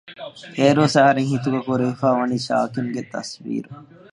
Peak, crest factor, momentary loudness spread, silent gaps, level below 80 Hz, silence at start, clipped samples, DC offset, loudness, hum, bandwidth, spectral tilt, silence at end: -2 dBFS; 18 dB; 16 LU; none; -64 dBFS; 0.05 s; under 0.1%; under 0.1%; -20 LUFS; none; 11.5 kHz; -6 dB/octave; 0.3 s